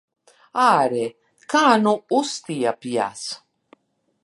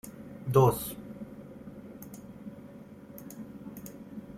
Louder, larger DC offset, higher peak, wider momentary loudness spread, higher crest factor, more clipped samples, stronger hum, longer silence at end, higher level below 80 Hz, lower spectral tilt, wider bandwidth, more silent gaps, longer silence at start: first, -21 LUFS vs -28 LUFS; neither; first, -2 dBFS vs -10 dBFS; second, 14 LU vs 23 LU; about the same, 20 dB vs 24 dB; neither; neither; first, 0.85 s vs 0 s; second, -74 dBFS vs -58 dBFS; second, -4 dB/octave vs -7 dB/octave; second, 11.5 kHz vs 16 kHz; neither; first, 0.55 s vs 0.05 s